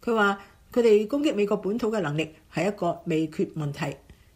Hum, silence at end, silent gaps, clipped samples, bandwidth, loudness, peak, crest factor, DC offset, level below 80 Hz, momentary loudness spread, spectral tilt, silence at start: none; 0.25 s; none; under 0.1%; 15.5 kHz; -26 LUFS; -10 dBFS; 16 dB; under 0.1%; -58 dBFS; 11 LU; -6.5 dB/octave; 0.05 s